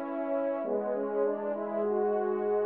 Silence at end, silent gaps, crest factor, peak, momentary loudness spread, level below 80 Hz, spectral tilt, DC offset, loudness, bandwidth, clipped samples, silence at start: 0 s; none; 12 dB; -18 dBFS; 3 LU; -88 dBFS; -7 dB/octave; under 0.1%; -31 LUFS; 3.5 kHz; under 0.1%; 0 s